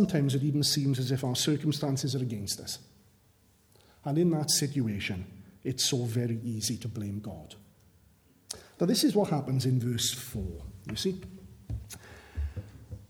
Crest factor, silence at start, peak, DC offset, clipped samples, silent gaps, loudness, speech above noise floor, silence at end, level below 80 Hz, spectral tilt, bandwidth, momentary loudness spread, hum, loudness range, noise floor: 18 dB; 0 s; -14 dBFS; under 0.1%; under 0.1%; none; -30 LUFS; 35 dB; 0.05 s; -50 dBFS; -4.5 dB/octave; 19 kHz; 17 LU; none; 4 LU; -64 dBFS